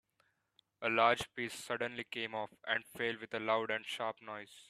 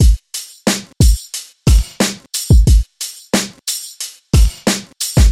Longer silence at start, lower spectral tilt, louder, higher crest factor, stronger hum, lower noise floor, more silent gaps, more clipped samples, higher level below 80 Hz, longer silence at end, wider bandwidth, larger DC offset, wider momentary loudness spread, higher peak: first, 0.8 s vs 0 s; about the same, -3.5 dB/octave vs -4.5 dB/octave; second, -36 LUFS vs -16 LUFS; first, 24 dB vs 12 dB; neither; first, -78 dBFS vs -31 dBFS; neither; neither; second, -76 dBFS vs -16 dBFS; about the same, 0.05 s vs 0 s; second, 14 kHz vs 16 kHz; neither; about the same, 11 LU vs 12 LU; second, -14 dBFS vs 0 dBFS